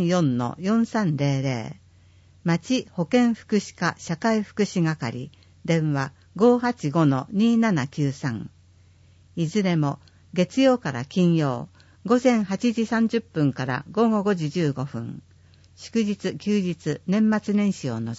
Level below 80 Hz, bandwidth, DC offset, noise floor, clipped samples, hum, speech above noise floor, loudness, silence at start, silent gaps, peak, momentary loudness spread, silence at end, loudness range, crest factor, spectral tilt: -62 dBFS; 8 kHz; under 0.1%; -54 dBFS; under 0.1%; none; 31 dB; -24 LUFS; 0 s; none; -6 dBFS; 12 LU; 0 s; 3 LU; 18 dB; -6.5 dB/octave